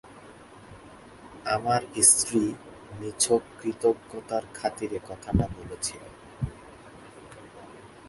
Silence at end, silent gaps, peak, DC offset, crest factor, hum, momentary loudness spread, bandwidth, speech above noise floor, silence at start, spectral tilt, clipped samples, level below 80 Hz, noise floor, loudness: 0 s; none; -4 dBFS; under 0.1%; 26 dB; none; 27 LU; 12 kHz; 22 dB; 0.05 s; -3.5 dB/octave; under 0.1%; -48 dBFS; -49 dBFS; -26 LUFS